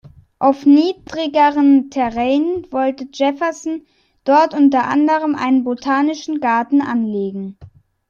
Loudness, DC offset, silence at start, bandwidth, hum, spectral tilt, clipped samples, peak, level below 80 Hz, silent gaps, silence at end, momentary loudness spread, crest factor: -16 LUFS; under 0.1%; 0.4 s; 7.2 kHz; none; -5.5 dB/octave; under 0.1%; -2 dBFS; -54 dBFS; none; 0.4 s; 11 LU; 14 dB